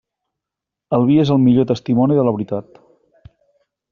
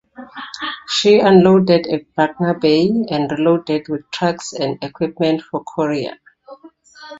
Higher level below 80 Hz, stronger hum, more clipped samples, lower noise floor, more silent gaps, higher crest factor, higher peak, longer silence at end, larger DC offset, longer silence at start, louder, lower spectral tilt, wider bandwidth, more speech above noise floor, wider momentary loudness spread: about the same, -54 dBFS vs -56 dBFS; neither; neither; first, -84 dBFS vs -43 dBFS; neither; about the same, 14 dB vs 16 dB; about the same, -2 dBFS vs 0 dBFS; first, 1.3 s vs 0 s; neither; first, 0.9 s vs 0.2 s; about the same, -16 LUFS vs -16 LUFS; first, -8.5 dB/octave vs -6 dB/octave; second, 6.8 kHz vs 8 kHz; first, 70 dB vs 27 dB; second, 10 LU vs 15 LU